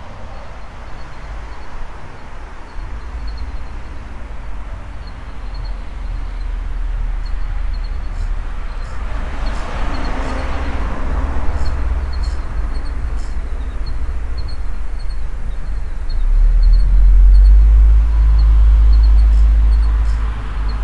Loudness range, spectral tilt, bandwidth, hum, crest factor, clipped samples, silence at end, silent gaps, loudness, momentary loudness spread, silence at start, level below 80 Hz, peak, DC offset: 18 LU; -7 dB/octave; 5.2 kHz; none; 14 dB; under 0.1%; 0 s; none; -19 LUFS; 20 LU; 0 s; -16 dBFS; 0 dBFS; under 0.1%